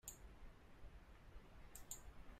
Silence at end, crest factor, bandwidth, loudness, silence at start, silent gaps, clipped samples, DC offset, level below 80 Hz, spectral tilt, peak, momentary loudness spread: 0 s; 26 dB; 15.5 kHz; -60 LUFS; 0.05 s; none; under 0.1%; under 0.1%; -62 dBFS; -3 dB/octave; -32 dBFS; 10 LU